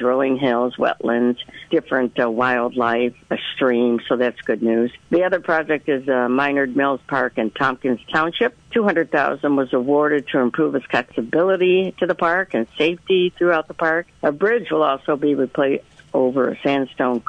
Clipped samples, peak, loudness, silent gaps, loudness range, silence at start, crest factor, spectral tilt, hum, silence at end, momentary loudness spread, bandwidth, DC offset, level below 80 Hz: under 0.1%; -6 dBFS; -19 LUFS; none; 1 LU; 0 s; 14 dB; -7 dB/octave; none; 0.1 s; 4 LU; 8.6 kHz; under 0.1%; -60 dBFS